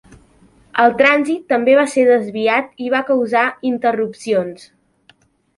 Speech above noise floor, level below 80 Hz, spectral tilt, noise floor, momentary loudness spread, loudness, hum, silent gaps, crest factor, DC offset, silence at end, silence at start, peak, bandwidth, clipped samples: 39 dB; -60 dBFS; -4.5 dB/octave; -54 dBFS; 7 LU; -16 LUFS; none; none; 16 dB; under 0.1%; 0.95 s; 0.75 s; 0 dBFS; 11.5 kHz; under 0.1%